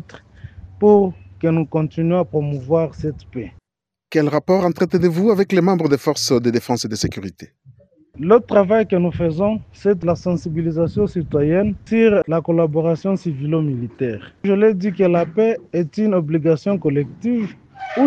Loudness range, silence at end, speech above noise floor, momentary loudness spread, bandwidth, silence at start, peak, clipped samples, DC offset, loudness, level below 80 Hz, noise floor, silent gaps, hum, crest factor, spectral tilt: 2 LU; 0 s; 67 dB; 9 LU; 14.5 kHz; 0.15 s; 0 dBFS; under 0.1%; under 0.1%; -18 LUFS; -48 dBFS; -85 dBFS; none; none; 18 dB; -7 dB/octave